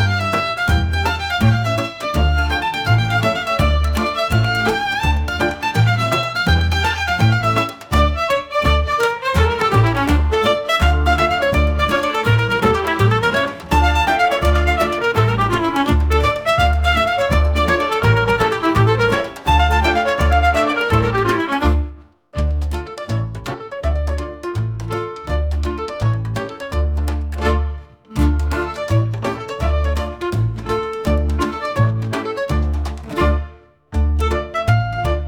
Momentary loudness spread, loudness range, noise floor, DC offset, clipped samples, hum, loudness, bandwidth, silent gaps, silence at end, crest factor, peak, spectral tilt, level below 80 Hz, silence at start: 8 LU; 6 LU; -38 dBFS; under 0.1%; under 0.1%; none; -18 LUFS; 18 kHz; none; 0 s; 14 dB; -2 dBFS; -6 dB/octave; -24 dBFS; 0 s